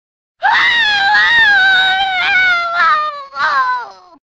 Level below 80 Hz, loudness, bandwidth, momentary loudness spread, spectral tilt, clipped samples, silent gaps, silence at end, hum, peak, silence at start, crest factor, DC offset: -50 dBFS; -11 LUFS; 8.4 kHz; 10 LU; -0.5 dB/octave; under 0.1%; none; 0.4 s; none; 0 dBFS; 0.4 s; 12 dB; under 0.1%